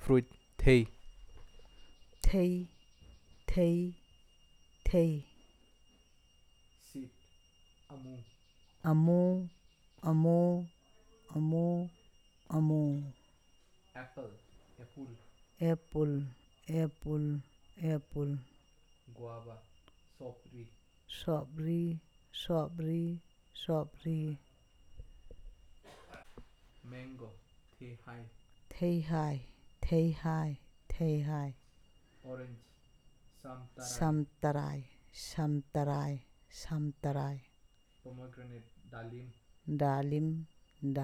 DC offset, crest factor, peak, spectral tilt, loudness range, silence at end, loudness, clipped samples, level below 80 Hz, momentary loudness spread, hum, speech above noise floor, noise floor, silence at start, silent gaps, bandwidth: under 0.1%; 24 dB; -12 dBFS; -7.5 dB/octave; 11 LU; 0 s; -35 LUFS; under 0.1%; -48 dBFS; 22 LU; none; 32 dB; -66 dBFS; 0 s; none; 13.5 kHz